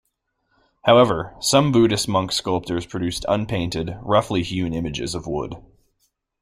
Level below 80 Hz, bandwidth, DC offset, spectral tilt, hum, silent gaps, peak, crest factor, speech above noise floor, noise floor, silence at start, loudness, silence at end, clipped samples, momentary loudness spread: -46 dBFS; 16 kHz; under 0.1%; -5 dB/octave; none; none; -2 dBFS; 20 dB; 51 dB; -72 dBFS; 0.85 s; -21 LUFS; 0.8 s; under 0.1%; 12 LU